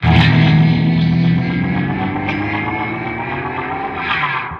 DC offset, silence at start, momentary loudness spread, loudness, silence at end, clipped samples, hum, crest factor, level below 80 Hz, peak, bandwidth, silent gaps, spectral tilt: under 0.1%; 0 s; 10 LU; -16 LUFS; 0 s; under 0.1%; none; 14 dB; -34 dBFS; 0 dBFS; 6 kHz; none; -8 dB/octave